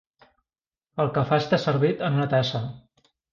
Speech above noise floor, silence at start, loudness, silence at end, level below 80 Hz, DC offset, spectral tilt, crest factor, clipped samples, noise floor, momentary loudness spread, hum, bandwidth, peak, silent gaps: over 67 dB; 0.95 s; -24 LUFS; 0.55 s; -58 dBFS; under 0.1%; -7 dB/octave; 18 dB; under 0.1%; under -90 dBFS; 10 LU; none; 7.2 kHz; -8 dBFS; none